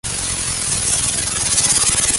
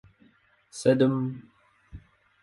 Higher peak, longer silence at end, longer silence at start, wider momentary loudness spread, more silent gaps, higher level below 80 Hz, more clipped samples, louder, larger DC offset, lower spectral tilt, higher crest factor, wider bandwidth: first, -2 dBFS vs -8 dBFS; second, 0 s vs 0.45 s; second, 0.05 s vs 0.75 s; second, 6 LU vs 22 LU; neither; first, -36 dBFS vs -58 dBFS; neither; first, -15 LUFS vs -25 LUFS; neither; second, -0.5 dB/octave vs -6.5 dB/octave; about the same, 16 dB vs 20 dB; about the same, 12 kHz vs 11.5 kHz